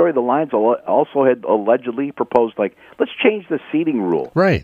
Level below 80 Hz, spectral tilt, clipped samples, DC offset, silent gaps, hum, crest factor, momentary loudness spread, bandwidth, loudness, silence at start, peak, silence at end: -52 dBFS; -8.5 dB/octave; under 0.1%; under 0.1%; none; none; 18 dB; 8 LU; 7 kHz; -18 LUFS; 0 s; 0 dBFS; 0 s